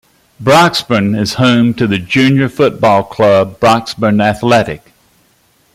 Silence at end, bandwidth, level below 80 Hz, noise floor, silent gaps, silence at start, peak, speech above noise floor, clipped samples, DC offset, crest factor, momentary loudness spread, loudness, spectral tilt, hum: 1 s; 16 kHz; -46 dBFS; -53 dBFS; none; 0.4 s; 0 dBFS; 43 dB; under 0.1%; under 0.1%; 12 dB; 5 LU; -11 LUFS; -5.5 dB/octave; none